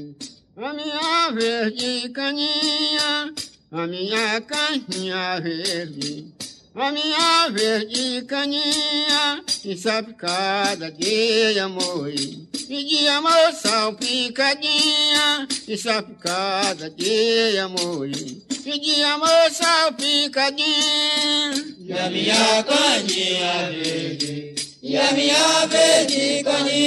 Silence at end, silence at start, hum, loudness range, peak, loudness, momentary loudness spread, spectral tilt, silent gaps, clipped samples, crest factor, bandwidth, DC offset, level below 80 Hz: 0 s; 0 s; none; 4 LU; -4 dBFS; -19 LUFS; 13 LU; -2 dB/octave; none; under 0.1%; 18 dB; 13 kHz; under 0.1%; -68 dBFS